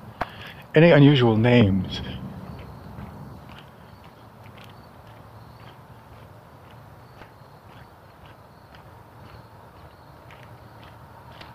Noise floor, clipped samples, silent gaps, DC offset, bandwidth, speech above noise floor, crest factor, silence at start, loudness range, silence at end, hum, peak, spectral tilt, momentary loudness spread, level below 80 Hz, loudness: -48 dBFS; under 0.1%; none; under 0.1%; 14.5 kHz; 31 dB; 22 dB; 0.05 s; 27 LU; 8.2 s; none; -4 dBFS; -8.5 dB/octave; 30 LU; -50 dBFS; -19 LUFS